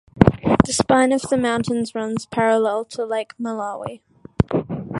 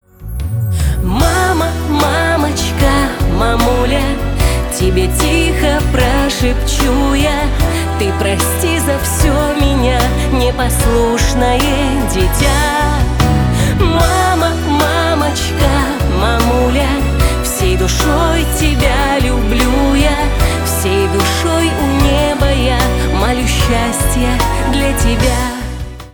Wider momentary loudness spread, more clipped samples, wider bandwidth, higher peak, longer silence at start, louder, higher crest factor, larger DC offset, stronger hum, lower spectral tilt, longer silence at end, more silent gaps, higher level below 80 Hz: first, 11 LU vs 3 LU; neither; second, 11.5 kHz vs over 20 kHz; about the same, 0 dBFS vs 0 dBFS; about the same, 0.15 s vs 0.2 s; second, -20 LUFS vs -13 LUFS; first, 20 dB vs 12 dB; neither; neither; about the same, -5.5 dB/octave vs -5 dB/octave; about the same, 0 s vs 0.05 s; neither; second, -38 dBFS vs -16 dBFS